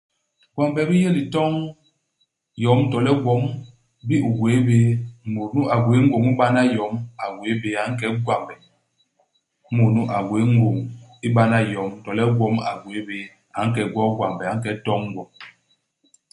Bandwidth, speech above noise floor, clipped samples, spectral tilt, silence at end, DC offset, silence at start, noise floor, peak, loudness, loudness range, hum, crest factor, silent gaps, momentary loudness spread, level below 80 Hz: 11.5 kHz; 50 dB; under 0.1%; -7.5 dB/octave; 0.8 s; under 0.1%; 0.55 s; -70 dBFS; -2 dBFS; -21 LUFS; 5 LU; none; 18 dB; none; 13 LU; -56 dBFS